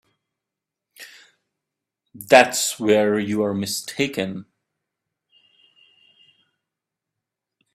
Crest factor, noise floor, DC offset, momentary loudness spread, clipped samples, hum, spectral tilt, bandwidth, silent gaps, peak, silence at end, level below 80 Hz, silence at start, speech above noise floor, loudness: 24 dB; -86 dBFS; under 0.1%; 27 LU; under 0.1%; none; -3.5 dB/octave; 16 kHz; none; 0 dBFS; 3.3 s; -68 dBFS; 1 s; 66 dB; -19 LUFS